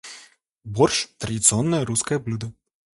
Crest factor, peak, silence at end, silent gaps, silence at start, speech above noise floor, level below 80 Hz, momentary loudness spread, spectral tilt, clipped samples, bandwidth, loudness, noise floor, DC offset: 22 dB; -2 dBFS; 0.45 s; none; 0.05 s; 29 dB; -52 dBFS; 15 LU; -4 dB/octave; under 0.1%; 11.5 kHz; -21 LUFS; -51 dBFS; under 0.1%